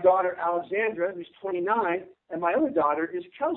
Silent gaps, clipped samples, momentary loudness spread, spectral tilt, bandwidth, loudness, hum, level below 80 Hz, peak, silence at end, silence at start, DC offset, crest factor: none; under 0.1%; 9 LU; -9.5 dB/octave; 4 kHz; -27 LUFS; none; -70 dBFS; -8 dBFS; 0 s; 0 s; under 0.1%; 18 dB